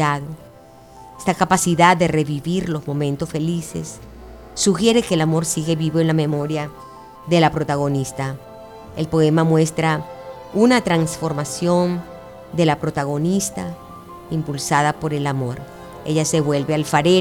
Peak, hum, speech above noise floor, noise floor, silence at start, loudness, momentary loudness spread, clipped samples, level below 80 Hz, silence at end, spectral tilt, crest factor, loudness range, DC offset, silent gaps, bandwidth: -2 dBFS; none; 25 dB; -44 dBFS; 0 s; -19 LUFS; 19 LU; under 0.1%; -48 dBFS; 0 s; -5 dB/octave; 18 dB; 3 LU; under 0.1%; none; 17.5 kHz